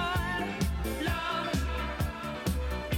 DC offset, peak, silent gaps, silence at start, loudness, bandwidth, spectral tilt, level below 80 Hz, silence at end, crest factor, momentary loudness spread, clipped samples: under 0.1%; -18 dBFS; none; 0 s; -32 LUFS; 18 kHz; -5 dB/octave; -36 dBFS; 0 s; 14 dB; 3 LU; under 0.1%